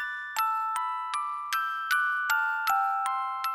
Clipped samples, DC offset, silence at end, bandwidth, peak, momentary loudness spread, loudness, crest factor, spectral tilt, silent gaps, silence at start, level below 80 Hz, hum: under 0.1%; under 0.1%; 0 s; 17 kHz; -12 dBFS; 5 LU; -28 LUFS; 18 dB; 2.5 dB/octave; none; 0 s; -72 dBFS; 60 Hz at -75 dBFS